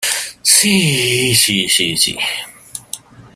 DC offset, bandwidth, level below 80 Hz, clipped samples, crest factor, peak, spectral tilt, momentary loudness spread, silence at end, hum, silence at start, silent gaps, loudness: under 0.1%; 16 kHz; -52 dBFS; under 0.1%; 16 dB; 0 dBFS; -2 dB/octave; 20 LU; 0.1 s; none; 0 s; none; -12 LUFS